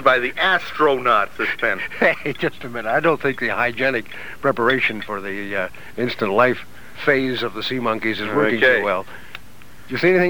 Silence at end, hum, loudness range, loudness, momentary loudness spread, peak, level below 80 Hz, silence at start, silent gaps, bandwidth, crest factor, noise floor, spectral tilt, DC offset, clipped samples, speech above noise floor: 0 s; none; 2 LU; -20 LUFS; 11 LU; -2 dBFS; -52 dBFS; 0 s; none; over 20 kHz; 18 dB; -45 dBFS; -5.5 dB/octave; 2%; under 0.1%; 25 dB